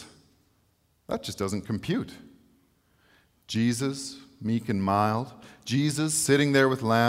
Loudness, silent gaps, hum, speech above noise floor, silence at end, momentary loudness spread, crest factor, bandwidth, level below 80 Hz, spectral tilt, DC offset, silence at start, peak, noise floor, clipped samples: -27 LUFS; none; none; 42 dB; 0 s; 14 LU; 20 dB; 16 kHz; -62 dBFS; -5 dB/octave; under 0.1%; 0 s; -8 dBFS; -68 dBFS; under 0.1%